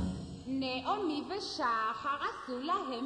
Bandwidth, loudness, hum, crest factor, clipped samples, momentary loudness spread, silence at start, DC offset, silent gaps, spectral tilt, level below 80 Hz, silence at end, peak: 10.5 kHz; -35 LUFS; none; 14 dB; under 0.1%; 7 LU; 0 s; under 0.1%; none; -5 dB/octave; -56 dBFS; 0 s; -22 dBFS